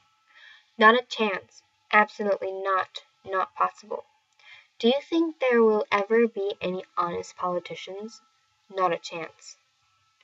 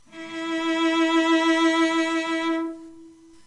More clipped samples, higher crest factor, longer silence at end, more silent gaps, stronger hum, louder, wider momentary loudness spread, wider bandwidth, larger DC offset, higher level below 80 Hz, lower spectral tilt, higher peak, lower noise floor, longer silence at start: neither; first, 24 dB vs 14 dB; first, 0.7 s vs 0.35 s; neither; neither; second, -25 LUFS vs -22 LUFS; first, 17 LU vs 13 LU; second, 8 kHz vs 10.5 kHz; neither; second, -78 dBFS vs -68 dBFS; first, -4.5 dB/octave vs -2 dB/octave; first, -4 dBFS vs -10 dBFS; first, -68 dBFS vs -48 dBFS; first, 0.8 s vs 0.15 s